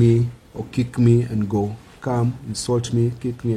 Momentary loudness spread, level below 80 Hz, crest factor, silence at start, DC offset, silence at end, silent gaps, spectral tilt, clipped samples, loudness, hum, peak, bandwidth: 11 LU; -46 dBFS; 14 dB; 0 s; under 0.1%; 0 s; none; -7.5 dB/octave; under 0.1%; -22 LUFS; none; -6 dBFS; 11 kHz